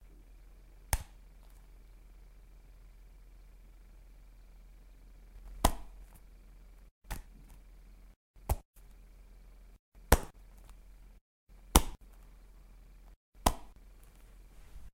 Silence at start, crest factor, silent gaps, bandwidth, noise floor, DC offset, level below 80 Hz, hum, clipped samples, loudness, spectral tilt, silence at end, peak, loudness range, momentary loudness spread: 0.8 s; 38 dB; 6.91-7.02 s, 8.16-8.34 s, 8.65-8.74 s, 9.79-9.92 s, 11.21-11.47 s, 13.16-13.32 s; 16 kHz; -56 dBFS; under 0.1%; -42 dBFS; none; under 0.1%; -34 LUFS; -4 dB/octave; 0.05 s; -2 dBFS; 24 LU; 29 LU